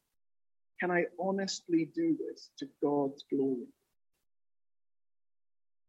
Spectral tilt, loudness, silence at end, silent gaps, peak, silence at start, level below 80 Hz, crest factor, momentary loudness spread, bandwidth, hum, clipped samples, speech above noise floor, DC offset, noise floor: -5 dB/octave; -33 LUFS; 2.2 s; none; -18 dBFS; 0.8 s; -88 dBFS; 18 dB; 11 LU; 8.2 kHz; none; under 0.1%; over 57 dB; under 0.1%; under -90 dBFS